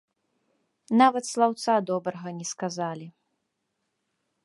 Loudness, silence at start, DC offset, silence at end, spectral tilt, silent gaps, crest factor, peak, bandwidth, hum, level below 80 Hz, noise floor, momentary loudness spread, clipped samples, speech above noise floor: -26 LUFS; 0.9 s; under 0.1%; 1.35 s; -4.5 dB/octave; none; 22 dB; -6 dBFS; 11.5 kHz; none; -82 dBFS; -79 dBFS; 13 LU; under 0.1%; 54 dB